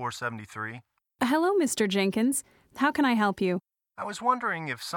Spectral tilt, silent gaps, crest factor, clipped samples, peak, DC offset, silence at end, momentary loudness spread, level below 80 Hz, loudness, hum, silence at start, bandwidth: -4 dB/octave; none; 16 dB; under 0.1%; -12 dBFS; under 0.1%; 0 s; 13 LU; -68 dBFS; -27 LUFS; none; 0 s; 19 kHz